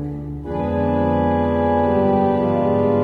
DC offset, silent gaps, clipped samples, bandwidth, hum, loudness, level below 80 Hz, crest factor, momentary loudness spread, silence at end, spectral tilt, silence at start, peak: 0.2%; none; under 0.1%; 4.7 kHz; none; -19 LUFS; -38 dBFS; 12 dB; 9 LU; 0 s; -10 dB/octave; 0 s; -6 dBFS